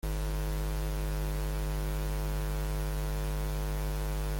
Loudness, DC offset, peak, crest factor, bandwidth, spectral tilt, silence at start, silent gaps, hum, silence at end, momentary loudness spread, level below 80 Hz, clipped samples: -35 LUFS; under 0.1%; -24 dBFS; 8 dB; 17 kHz; -5.5 dB/octave; 0.05 s; none; none; 0 s; 0 LU; -34 dBFS; under 0.1%